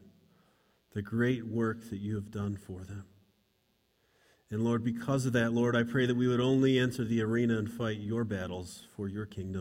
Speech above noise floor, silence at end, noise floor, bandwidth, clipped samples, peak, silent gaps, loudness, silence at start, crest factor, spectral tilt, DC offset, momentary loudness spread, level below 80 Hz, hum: 43 dB; 0 s; -74 dBFS; 16 kHz; under 0.1%; -14 dBFS; none; -32 LUFS; 0.95 s; 18 dB; -6.5 dB/octave; under 0.1%; 14 LU; -64 dBFS; none